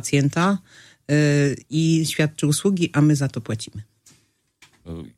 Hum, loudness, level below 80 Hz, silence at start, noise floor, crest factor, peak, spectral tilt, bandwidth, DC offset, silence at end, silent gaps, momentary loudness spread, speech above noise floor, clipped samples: none; -21 LUFS; -56 dBFS; 0 s; -62 dBFS; 16 dB; -6 dBFS; -5.5 dB/octave; 14.5 kHz; under 0.1%; 0.1 s; none; 17 LU; 42 dB; under 0.1%